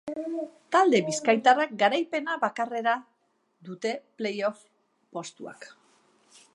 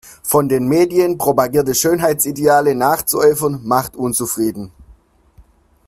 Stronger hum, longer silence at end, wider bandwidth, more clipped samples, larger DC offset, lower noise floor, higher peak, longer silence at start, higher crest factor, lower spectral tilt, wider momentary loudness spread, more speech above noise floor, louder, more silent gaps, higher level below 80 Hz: neither; first, 0.9 s vs 0.45 s; second, 11.5 kHz vs 16 kHz; neither; neither; first, -72 dBFS vs -49 dBFS; second, -6 dBFS vs 0 dBFS; about the same, 0.05 s vs 0.05 s; first, 22 dB vs 16 dB; about the same, -3.5 dB/octave vs -4.5 dB/octave; first, 19 LU vs 6 LU; first, 45 dB vs 34 dB; second, -26 LUFS vs -15 LUFS; neither; second, -82 dBFS vs -48 dBFS